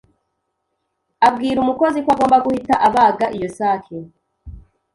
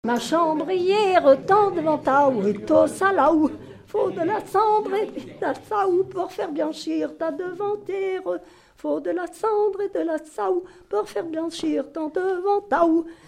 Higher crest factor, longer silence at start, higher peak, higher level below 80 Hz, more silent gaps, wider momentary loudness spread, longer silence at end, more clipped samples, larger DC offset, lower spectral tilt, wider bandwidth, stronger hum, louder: about the same, 16 dB vs 18 dB; first, 1.2 s vs 0.05 s; about the same, -2 dBFS vs -4 dBFS; first, -48 dBFS vs -60 dBFS; neither; about the same, 8 LU vs 10 LU; first, 0.35 s vs 0.15 s; neither; neither; about the same, -5.5 dB/octave vs -5.5 dB/octave; second, 11.5 kHz vs 14.5 kHz; neither; first, -16 LUFS vs -23 LUFS